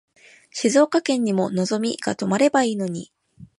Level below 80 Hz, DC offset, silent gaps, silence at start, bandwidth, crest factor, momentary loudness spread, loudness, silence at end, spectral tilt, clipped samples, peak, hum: -66 dBFS; under 0.1%; none; 0.55 s; 11.5 kHz; 18 dB; 10 LU; -21 LUFS; 0.15 s; -5 dB/octave; under 0.1%; -4 dBFS; none